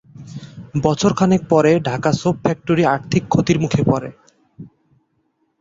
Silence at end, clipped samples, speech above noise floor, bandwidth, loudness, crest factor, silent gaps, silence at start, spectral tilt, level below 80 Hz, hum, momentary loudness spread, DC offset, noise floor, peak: 0.95 s; under 0.1%; 50 dB; 7.8 kHz; -17 LUFS; 16 dB; none; 0.15 s; -6.5 dB/octave; -48 dBFS; none; 21 LU; under 0.1%; -66 dBFS; -2 dBFS